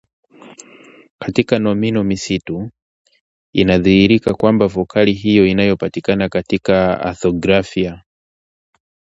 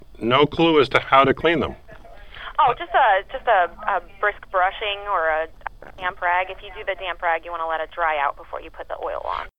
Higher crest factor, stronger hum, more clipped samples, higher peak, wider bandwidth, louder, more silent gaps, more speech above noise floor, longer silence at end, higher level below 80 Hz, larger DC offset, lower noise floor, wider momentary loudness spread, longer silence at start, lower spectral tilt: about the same, 16 dB vs 20 dB; neither; neither; about the same, 0 dBFS vs -2 dBFS; second, 8 kHz vs 9.6 kHz; first, -15 LUFS vs -21 LUFS; first, 1.10-1.18 s, 2.82-3.05 s, 3.21-3.53 s vs none; first, 29 dB vs 21 dB; first, 1.2 s vs 0.1 s; about the same, -42 dBFS vs -46 dBFS; second, under 0.1% vs 0.5%; about the same, -43 dBFS vs -42 dBFS; second, 10 LU vs 14 LU; first, 0.45 s vs 0.15 s; about the same, -6.5 dB/octave vs -6 dB/octave